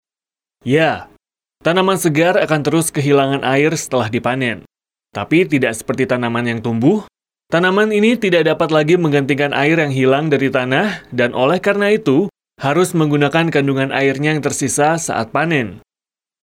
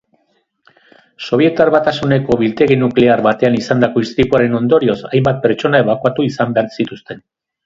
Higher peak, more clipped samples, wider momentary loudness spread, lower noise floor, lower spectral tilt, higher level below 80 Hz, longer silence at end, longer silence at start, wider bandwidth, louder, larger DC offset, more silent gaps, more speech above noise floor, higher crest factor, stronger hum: about the same, -2 dBFS vs 0 dBFS; neither; about the same, 6 LU vs 8 LU; first, under -90 dBFS vs -62 dBFS; second, -5 dB/octave vs -7.5 dB/octave; second, -56 dBFS vs -46 dBFS; first, 0.65 s vs 0.5 s; second, 0.65 s vs 1.2 s; first, 16.5 kHz vs 7.6 kHz; about the same, -15 LUFS vs -14 LUFS; neither; neither; first, over 75 dB vs 49 dB; about the same, 12 dB vs 14 dB; neither